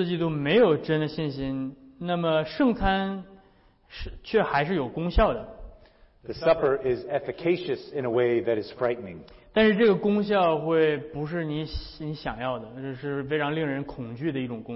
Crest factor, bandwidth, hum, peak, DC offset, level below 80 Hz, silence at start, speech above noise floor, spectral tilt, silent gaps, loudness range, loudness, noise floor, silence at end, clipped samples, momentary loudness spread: 16 dB; 5.8 kHz; none; -10 dBFS; under 0.1%; -42 dBFS; 0 s; 33 dB; -10.5 dB/octave; none; 4 LU; -26 LUFS; -59 dBFS; 0 s; under 0.1%; 14 LU